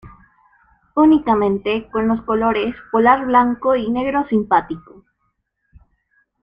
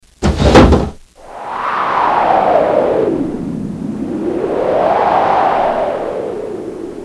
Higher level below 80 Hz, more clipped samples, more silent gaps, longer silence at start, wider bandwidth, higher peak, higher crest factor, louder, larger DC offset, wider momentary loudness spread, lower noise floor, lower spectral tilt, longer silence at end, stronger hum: second, -48 dBFS vs -26 dBFS; neither; neither; second, 0.05 s vs 0.2 s; second, 5.2 kHz vs 12 kHz; about the same, -2 dBFS vs 0 dBFS; about the same, 16 dB vs 14 dB; second, -17 LUFS vs -14 LUFS; neither; second, 8 LU vs 13 LU; first, -70 dBFS vs -33 dBFS; first, -8.5 dB/octave vs -6.5 dB/octave; first, 1.65 s vs 0 s; neither